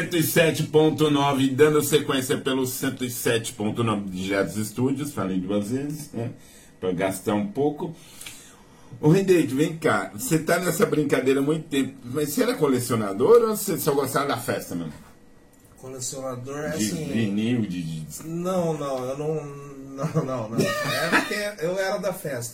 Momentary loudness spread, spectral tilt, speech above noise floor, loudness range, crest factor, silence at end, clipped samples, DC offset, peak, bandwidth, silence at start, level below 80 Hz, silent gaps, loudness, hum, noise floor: 13 LU; -5 dB/octave; 28 dB; 7 LU; 20 dB; 0 s; under 0.1%; under 0.1%; -4 dBFS; 16.5 kHz; 0 s; -58 dBFS; none; -24 LUFS; none; -52 dBFS